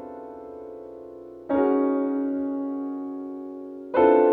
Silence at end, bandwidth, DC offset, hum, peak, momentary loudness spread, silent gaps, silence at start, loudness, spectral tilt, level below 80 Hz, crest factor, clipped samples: 0 s; 3.9 kHz; under 0.1%; none; -6 dBFS; 20 LU; none; 0 s; -25 LUFS; -9 dB/octave; -62 dBFS; 18 dB; under 0.1%